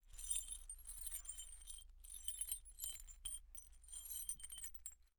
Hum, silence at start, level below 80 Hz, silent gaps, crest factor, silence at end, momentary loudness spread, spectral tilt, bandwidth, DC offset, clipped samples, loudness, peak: none; 0.05 s; -60 dBFS; none; 24 dB; 0.1 s; 12 LU; 1.5 dB/octave; over 20 kHz; under 0.1%; under 0.1%; -48 LUFS; -28 dBFS